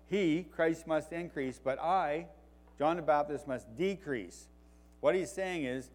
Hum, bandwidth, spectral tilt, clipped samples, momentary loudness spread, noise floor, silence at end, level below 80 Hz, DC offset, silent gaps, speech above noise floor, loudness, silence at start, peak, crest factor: none; 16.5 kHz; -5.5 dB/octave; under 0.1%; 9 LU; -59 dBFS; 0.05 s; -60 dBFS; under 0.1%; none; 26 dB; -34 LUFS; 0.1 s; -16 dBFS; 20 dB